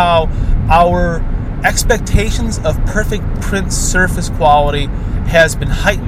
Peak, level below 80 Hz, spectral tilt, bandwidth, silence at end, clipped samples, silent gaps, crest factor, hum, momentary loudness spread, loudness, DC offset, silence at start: 0 dBFS; -18 dBFS; -4.5 dB/octave; 15.5 kHz; 0 s; under 0.1%; none; 12 dB; none; 8 LU; -14 LUFS; under 0.1%; 0 s